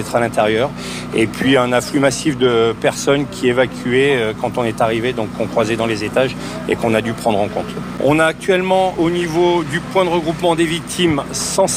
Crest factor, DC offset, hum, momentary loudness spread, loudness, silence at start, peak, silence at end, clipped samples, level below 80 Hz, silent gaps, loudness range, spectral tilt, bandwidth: 12 dB; under 0.1%; none; 6 LU; -17 LUFS; 0 s; -4 dBFS; 0 s; under 0.1%; -44 dBFS; none; 2 LU; -4.5 dB/octave; 16 kHz